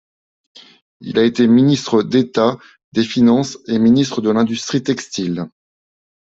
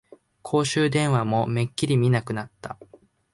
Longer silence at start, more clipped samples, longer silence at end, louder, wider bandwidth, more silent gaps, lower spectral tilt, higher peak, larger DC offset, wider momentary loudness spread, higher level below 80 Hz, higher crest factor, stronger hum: first, 1 s vs 0.45 s; neither; first, 0.85 s vs 0.6 s; first, -16 LUFS vs -23 LUFS; second, 7.8 kHz vs 11.5 kHz; first, 2.84-2.92 s vs none; about the same, -6 dB/octave vs -6 dB/octave; first, -2 dBFS vs -10 dBFS; neither; second, 11 LU vs 18 LU; about the same, -56 dBFS vs -58 dBFS; about the same, 14 dB vs 14 dB; neither